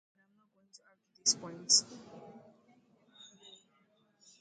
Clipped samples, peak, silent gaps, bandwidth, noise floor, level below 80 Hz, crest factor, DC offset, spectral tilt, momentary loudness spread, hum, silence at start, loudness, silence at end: under 0.1%; -12 dBFS; none; 10.5 kHz; -72 dBFS; -86 dBFS; 26 dB; under 0.1%; 0 dB/octave; 26 LU; none; 1.25 s; -29 LUFS; 2.05 s